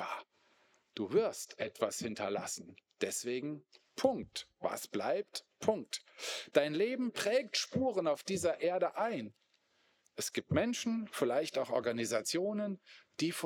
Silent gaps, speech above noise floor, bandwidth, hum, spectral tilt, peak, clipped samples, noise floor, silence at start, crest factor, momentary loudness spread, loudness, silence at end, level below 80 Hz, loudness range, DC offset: none; 39 dB; 19.5 kHz; none; -4 dB/octave; -12 dBFS; under 0.1%; -75 dBFS; 0 s; 24 dB; 10 LU; -36 LUFS; 0 s; -78 dBFS; 4 LU; under 0.1%